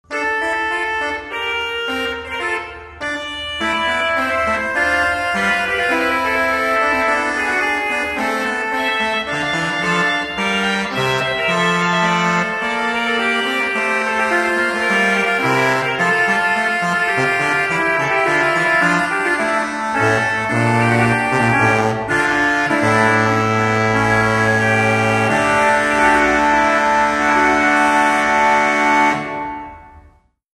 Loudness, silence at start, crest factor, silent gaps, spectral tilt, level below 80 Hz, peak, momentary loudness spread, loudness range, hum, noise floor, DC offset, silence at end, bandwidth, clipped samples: -16 LUFS; 0.1 s; 14 dB; none; -4.5 dB/octave; -46 dBFS; -2 dBFS; 6 LU; 4 LU; none; -50 dBFS; under 0.1%; 0.55 s; 13 kHz; under 0.1%